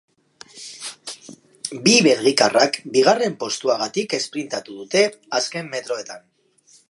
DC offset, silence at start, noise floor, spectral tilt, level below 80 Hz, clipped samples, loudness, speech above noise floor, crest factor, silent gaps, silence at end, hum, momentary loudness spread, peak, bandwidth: under 0.1%; 0.55 s; -56 dBFS; -3 dB/octave; -74 dBFS; under 0.1%; -19 LUFS; 36 dB; 20 dB; none; 0.7 s; none; 20 LU; 0 dBFS; 11.5 kHz